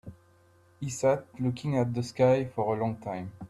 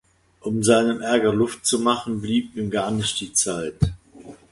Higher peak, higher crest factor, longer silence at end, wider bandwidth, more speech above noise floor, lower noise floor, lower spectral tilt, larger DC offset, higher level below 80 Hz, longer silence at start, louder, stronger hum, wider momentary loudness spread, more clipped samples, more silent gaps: second, -12 dBFS vs -4 dBFS; about the same, 18 dB vs 20 dB; about the same, 0.05 s vs 0.15 s; about the same, 12.5 kHz vs 11.5 kHz; first, 33 dB vs 23 dB; first, -61 dBFS vs -44 dBFS; first, -7 dB/octave vs -4 dB/octave; neither; second, -62 dBFS vs -42 dBFS; second, 0.05 s vs 0.45 s; second, -29 LUFS vs -22 LUFS; neither; first, 12 LU vs 7 LU; neither; neither